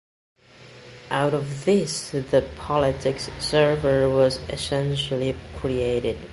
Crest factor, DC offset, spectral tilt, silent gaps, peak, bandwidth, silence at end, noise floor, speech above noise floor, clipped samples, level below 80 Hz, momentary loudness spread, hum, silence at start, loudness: 16 dB; under 0.1%; -5.5 dB/octave; none; -6 dBFS; 11.5 kHz; 0 s; -47 dBFS; 24 dB; under 0.1%; -44 dBFS; 9 LU; none; 0.6 s; -23 LUFS